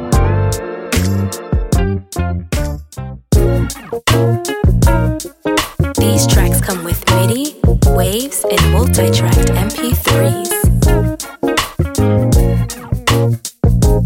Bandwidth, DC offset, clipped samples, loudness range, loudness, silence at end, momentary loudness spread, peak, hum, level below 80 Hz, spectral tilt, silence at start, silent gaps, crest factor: 17 kHz; under 0.1%; under 0.1%; 4 LU; -14 LUFS; 0 s; 8 LU; 0 dBFS; none; -20 dBFS; -5.5 dB/octave; 0 s; none; 12 dB